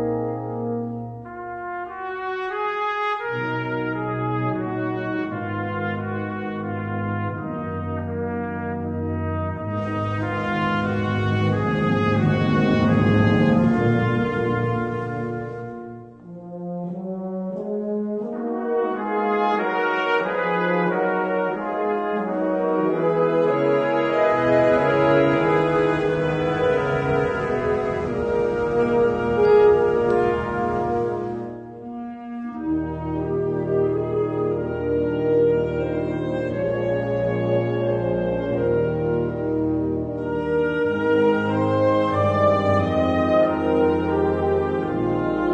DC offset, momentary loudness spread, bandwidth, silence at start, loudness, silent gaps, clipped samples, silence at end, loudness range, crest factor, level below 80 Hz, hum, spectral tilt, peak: under 0.1%; 11 LU; 8.6 kHz; 0 s; -22 LUFS; none; under 0.1%; 0 s; 8 LU; 16 dB; -46 dBFS; none; -8.5 dB/octave; -6 dBFS